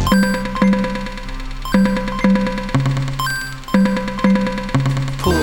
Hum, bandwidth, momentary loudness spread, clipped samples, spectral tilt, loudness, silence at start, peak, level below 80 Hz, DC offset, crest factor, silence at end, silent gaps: none; 19 kHz; 8 LU; under 0.1%; -6 dB/octave; -18 LUFS; 0 s; 0 dBFS; -30 dBFS; under 0.1%; 16 dB; 0 s; none